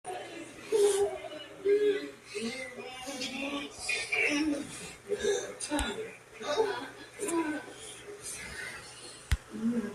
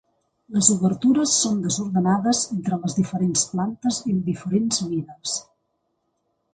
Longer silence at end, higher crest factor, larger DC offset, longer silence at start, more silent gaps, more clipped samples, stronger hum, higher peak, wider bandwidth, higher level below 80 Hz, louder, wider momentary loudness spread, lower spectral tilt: second, 0 s vs 1.1 s; about the same, 20 dB vs 24 dB; neither; second, 0.05 s vs 0.5 s; neither; neither; neither; second, -12 dBFS vs 0 dBFS; first, 14 kHz vs 9.6 kHz; first, -50 dBFS vs -58 dBFS; second, -33 LUFS vs -22 LUFS; first, 16 LU vs 10 LU; about the same, -3.5 dB/octave vs -4 dB/octave